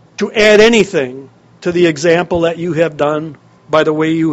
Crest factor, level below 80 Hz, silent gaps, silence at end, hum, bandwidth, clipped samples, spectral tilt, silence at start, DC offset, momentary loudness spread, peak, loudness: 12 dB; -44 dBFS; none; 0 s; none; 9.6 kHz; 0.2%; -5 dB/octave; 0.2 s; under 0.1%; 12 LU; 0 dBFS; -12 LUFS